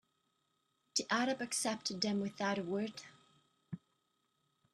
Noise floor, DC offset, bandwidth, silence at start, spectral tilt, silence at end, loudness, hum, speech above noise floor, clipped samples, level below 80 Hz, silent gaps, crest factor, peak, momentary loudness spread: -81 dBFS; under 0.1%; 13 kHz; 0.95 s; -3 dB/octave; 0.95 s; -37 LUFS; none; 44 dB; under 0.1%; -82 dBFS; none; 22 dB; -20 dBFS; 17 LU